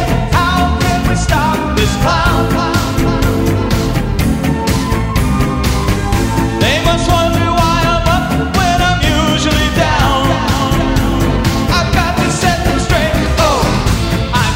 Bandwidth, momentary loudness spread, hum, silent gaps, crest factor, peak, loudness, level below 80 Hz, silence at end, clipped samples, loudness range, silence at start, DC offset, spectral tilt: 16.5 kHz; 3 LU; none; none; 12 dB; 0 dBFS; -13 LUFS; -20 dBFS; 0 s; under 0.1%; 2 LU; 0 s; under 0.1%; -5 dB/octave